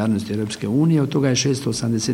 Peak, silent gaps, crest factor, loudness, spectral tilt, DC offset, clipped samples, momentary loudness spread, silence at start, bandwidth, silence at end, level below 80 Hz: -4 dBFS; none; 14 dB; -20 LUFS; -5.5 dB/octave; under 0.1%; under 0.1%; 6 LU; 0 s; 15.5 kHz; 0 s; -54 dBFS